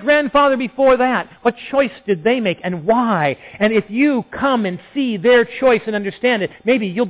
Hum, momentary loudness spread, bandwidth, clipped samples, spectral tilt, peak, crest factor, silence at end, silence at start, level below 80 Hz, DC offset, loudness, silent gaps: none; 7 LU; 4 kHz; under 0.1%; -9.5 dB/octave; -6 dBFS; 12 dB; 0 s; 0 s; -52 dBFS; under 0.1%; -17 LUFS; none